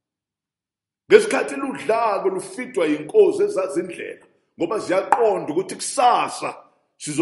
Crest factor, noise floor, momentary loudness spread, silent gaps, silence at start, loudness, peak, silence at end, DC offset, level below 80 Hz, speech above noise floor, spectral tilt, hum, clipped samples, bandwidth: 22 dB; -89 dBFS; 13 LU; none; 1.1 s; -20 LUFS; 0 dBFS; 0 s; under 0.1%; -70 dBFS; 69 dB; -4 dB/octave; none; under 0.1%; 11.5 kHz